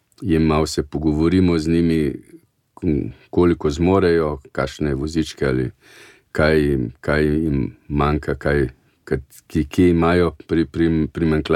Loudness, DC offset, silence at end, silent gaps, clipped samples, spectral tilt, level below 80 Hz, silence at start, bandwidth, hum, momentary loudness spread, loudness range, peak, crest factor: -20 LUFS; under 0.1%; 0 s; none; under 0.1%; -7 dB/octave; -34 dBFS; 0.2 s; 13.5 kHz; none; 9 LU; 2 LU; -2 dBFS; 16 dB